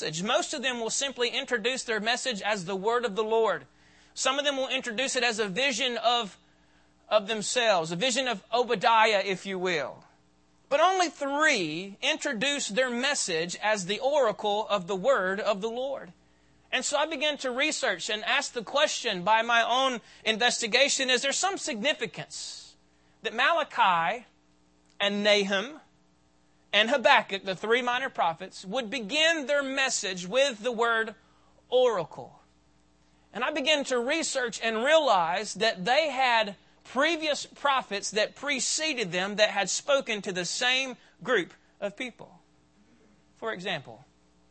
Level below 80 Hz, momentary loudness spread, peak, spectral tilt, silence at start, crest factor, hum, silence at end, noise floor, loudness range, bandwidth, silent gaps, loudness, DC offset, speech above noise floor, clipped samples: -72 dBFS; 11 LU; -6 dBFS; -2 dB/octave; 0 s; 24 dB; none; 0.55 s; -65 dBFS; 4 LU; 8.8 kHz; none; -26 LUFS; under 0.1%; 38 dB; under 0.1%